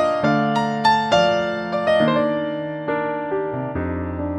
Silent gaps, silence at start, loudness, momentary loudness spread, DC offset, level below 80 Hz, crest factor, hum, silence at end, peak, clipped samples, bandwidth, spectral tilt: none; 0 s; -20 LUFS; 8 LU; under 0.1%; -46 dBFS; 16 dB; none; 0 s; -4 dBFS; under 0.1%; 11 kHz; -6 dB/octave